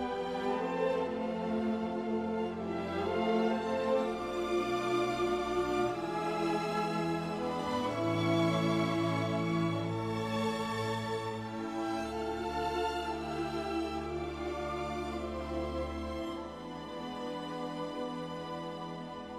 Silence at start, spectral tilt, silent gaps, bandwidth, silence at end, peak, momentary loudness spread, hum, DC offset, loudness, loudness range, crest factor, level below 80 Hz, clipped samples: 0 s; -6 dB/octave; none; 15.5 kHz; 0 s; -18 dBFS; 8 LU; none; under 0.1%; -34 LUFS; 6 LU; 16 dB; -54 dBFS; under 0.1%